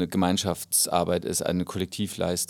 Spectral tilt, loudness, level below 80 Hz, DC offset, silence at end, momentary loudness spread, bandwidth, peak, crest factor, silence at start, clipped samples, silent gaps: -4 dB/octave; -26 LUFS; -54 dBFS; under 0.1%; 0.05 s; 8 LU; 19.5 kHz; -8 dBFS; 18 dB; 0 s; under 0.1%; none